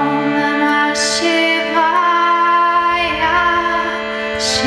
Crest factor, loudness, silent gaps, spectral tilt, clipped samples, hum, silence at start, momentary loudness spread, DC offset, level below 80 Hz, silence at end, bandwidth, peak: 14 dB; -14 LUFS; none; -2.5 dB/octave; under 0.1%; none; 0 s; 5 LU; under 0.1%; -44 dBFS; 0 s; 12.5 kHz; -2 dBFS